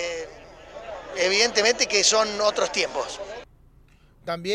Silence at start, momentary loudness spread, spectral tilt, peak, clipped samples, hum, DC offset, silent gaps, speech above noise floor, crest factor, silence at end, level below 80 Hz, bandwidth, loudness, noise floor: 0 s; 22 LU; -0.5 dB/octave; -6 dBFS; under 0.1%; none; under 0.1%; none; 32 dB; 20 dB; 0 s; -54 dBFS; 15 kHz; -21 LUFS; -55 dBFS